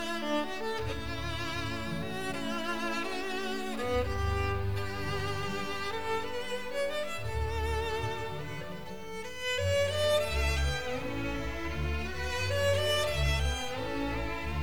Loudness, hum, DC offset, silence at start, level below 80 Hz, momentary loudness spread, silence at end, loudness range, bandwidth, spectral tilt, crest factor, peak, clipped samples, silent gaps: -33 LUFS; none; 0.9%; 0 s; -40 dBFS; 7 LU; 0 s; 3 LU; 20 kHz; -4.5 dB/octave; 16 dB; -16 dBFS; under 0.1%; none